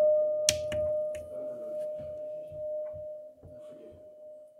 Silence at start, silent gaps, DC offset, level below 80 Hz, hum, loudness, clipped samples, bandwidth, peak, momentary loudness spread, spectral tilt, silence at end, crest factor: 0 s; none; under 0.1%; -64 dBFS; none; -33 LUFS; under 0.1%; 16 kHz; -4 dBFS; 23 LU; -2 dB/octave; 0 s; 30 dB